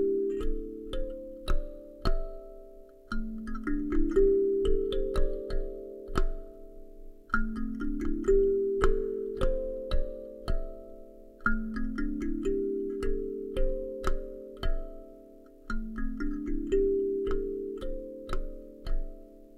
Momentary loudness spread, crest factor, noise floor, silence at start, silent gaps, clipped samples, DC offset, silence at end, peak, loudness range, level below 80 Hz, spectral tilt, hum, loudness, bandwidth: 19 LU; 20 dB; -52 dBFS; 0 s; none; under 0.1%; under 0.1%; 0 s; -10 dBFS; 7 LU; -34 dBFS; -7 dB/octave; none; -33 LUFS; 7.6 kHz